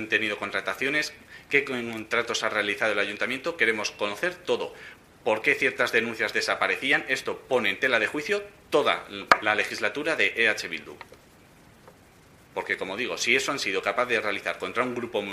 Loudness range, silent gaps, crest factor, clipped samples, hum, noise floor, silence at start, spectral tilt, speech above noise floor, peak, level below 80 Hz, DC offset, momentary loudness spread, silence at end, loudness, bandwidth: 4 LU; none; 26 dB; under 0.1%; none; -54 dBFS; 0 s; -2.5 dB/octave; 27 dB; -2 dBFS; -64 dBFS; under 0.1%; 8 LU; 0 s; -25 LUFS; 15.5 kHz